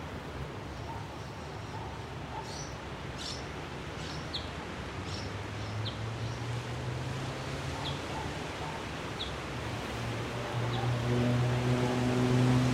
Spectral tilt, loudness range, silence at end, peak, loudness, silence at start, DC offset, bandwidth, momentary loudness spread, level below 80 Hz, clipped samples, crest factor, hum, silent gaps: -6 dB/octave; 8 LU; 0 s; -16 dBFS; -35 LUFS; 0 s; under 0.1%; 13.5 kHz; 11 LU; -50 dBFS; under 0.1%; 18 dB; none; none